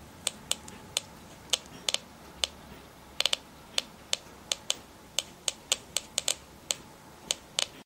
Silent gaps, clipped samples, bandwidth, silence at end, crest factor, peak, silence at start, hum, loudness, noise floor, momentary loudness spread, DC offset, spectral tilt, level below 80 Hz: none; under 0.1%; 16 kHz; 0.05 s; 32 dB; -4 dBFS; 0 s; none; -32 LUFS; -50 dBFS; 19 LU; under 0.1%; 0.5 dB/octave; -60 dBFS